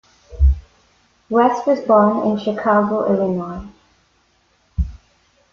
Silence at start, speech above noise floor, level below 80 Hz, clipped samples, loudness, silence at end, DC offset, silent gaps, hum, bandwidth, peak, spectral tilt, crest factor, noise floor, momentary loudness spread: 0.3 s; 44 dB; -26 dBFS; under 0.1%; -18 LUFS; 0.55 s; under 0.1%; none; none; 6.8 kHz; -2 dBFS; -8.5 dB/octave; 16 dB; -60 dBFS; 14 LU